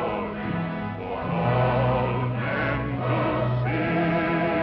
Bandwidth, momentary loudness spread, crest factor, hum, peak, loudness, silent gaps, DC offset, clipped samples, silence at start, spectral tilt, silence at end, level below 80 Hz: 5.4 kHz; 7 LU; 14 dB; none; -12 dBFS; -25 LUFS; none; under 0.1%; under 0.1%; 0 s; -10 dB/octave; 0 s; -44 dBFS